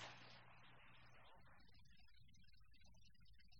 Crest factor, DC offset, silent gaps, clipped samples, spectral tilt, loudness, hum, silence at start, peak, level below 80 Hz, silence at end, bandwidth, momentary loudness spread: 22 dB; under 0.1%; none; under 0.1%; -3.5 dB/octave; -65 LUFS; none; 0 s; -44 dBFS; -76 dBFS; 0 s; 17 kHz; 8 LU